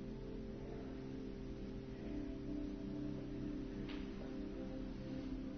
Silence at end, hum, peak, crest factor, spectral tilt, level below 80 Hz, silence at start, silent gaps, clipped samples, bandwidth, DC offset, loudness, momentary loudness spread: 0 s; none; -34 dBFS; 12 dB; -7.5 dB/octave; -54 dBFS; 0 s; none; under 0.1%; 6.4 kHz; under 0.1%; -47 LUFS; 3 LU